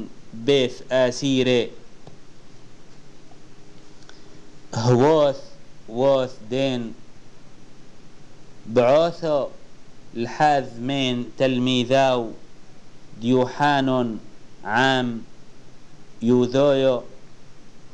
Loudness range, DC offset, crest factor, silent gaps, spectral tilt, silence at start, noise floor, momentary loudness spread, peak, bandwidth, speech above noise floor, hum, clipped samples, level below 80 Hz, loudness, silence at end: 4 LU; 1%; 16 dB; none; -5.5 dB/octave; 0 s; -43 dBFS; 15 LU; -6 dBFS; 9.4 kHz; 23 dB; none; under 0.1%; -50 dBFS; -21 LUFS; 0 s